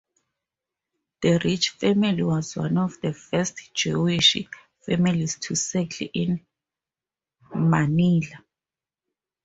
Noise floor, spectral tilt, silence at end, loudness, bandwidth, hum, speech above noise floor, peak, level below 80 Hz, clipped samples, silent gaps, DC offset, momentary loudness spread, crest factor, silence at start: under -90 dBFS; -4.5 dB/octave; 1.05 s; -23 LUFS; 8 kHz; none; over 67 dB; -4 dBFS; -58 dBFS; under 0.1%; none; under 0.1%; 10 LU; 20 dB; 1.2 s